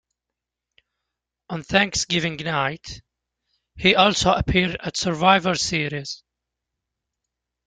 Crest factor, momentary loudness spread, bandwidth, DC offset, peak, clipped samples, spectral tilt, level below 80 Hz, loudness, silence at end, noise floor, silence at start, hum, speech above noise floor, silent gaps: 22 dB; 18 LU; 9.6 kHz; under 0.1%; -2 dBFS; under 0.1%; -3.5 dB/octave; -44 dBFS; -20 LUFS; 1.5 s; -85 dBFS; 1.5 s; 60 Hz at -55 dBFS; 64 dB; none